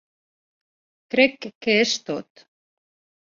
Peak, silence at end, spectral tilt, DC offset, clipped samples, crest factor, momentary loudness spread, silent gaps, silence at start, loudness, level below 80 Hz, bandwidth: -4 dBFS; 1 s; -3 dB/octave; under 0.1%; under 0.1%; 22 dB; 12 LU; 1.55-1.61 s; 1.15 s; -21 LUFS; -72 dBFS; 7.6 kHz